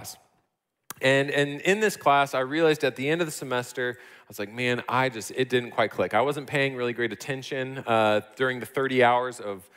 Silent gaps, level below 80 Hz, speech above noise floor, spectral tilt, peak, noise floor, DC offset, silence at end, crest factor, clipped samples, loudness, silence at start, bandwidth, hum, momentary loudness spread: none; -72 dBFS; 52 dB; -4.5 dB/octave; -8 dBFS; -77 dBFS; under 0.1%; 0.15 s; 18 dB; under 0.1%; -25 LUFS; 0 s; 16 kHz; none; 10 LU